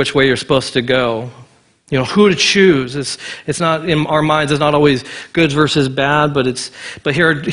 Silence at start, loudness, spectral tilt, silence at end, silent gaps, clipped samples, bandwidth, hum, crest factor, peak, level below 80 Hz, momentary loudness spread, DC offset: 0 s; -14 LUFS; -5 dB/octave; 0 s; none; under 0.1%; 11 kHz; none; 14 dB; 0 dBFS; -44 dBFS; 11 LU; under 0.1%